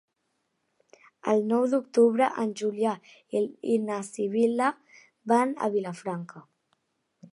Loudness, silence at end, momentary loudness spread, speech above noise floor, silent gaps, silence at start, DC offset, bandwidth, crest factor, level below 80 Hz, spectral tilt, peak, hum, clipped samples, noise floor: -27 LUFS; 0.9 s; 13 LU; 51 dB; none; 1.25 s; under 0.1%; 11 kHz; 18 dB; -82 dBFS; -6 dB/octave; -10 dBFS; none; under 0.1%; -77 dBFS